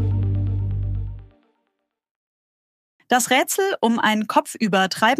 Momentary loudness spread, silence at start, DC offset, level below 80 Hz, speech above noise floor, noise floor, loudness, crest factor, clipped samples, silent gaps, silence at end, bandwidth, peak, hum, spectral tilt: 9 LU; 0 s; under 0.1%; -38 dBFS; 57 dB; -76 dBFS; -21 LUFS; 18 dB; under 0.1%; 2.11-2.99 s; 0 s; 15.5 kHz; -4 dBFS; none; -4.5 dB/octave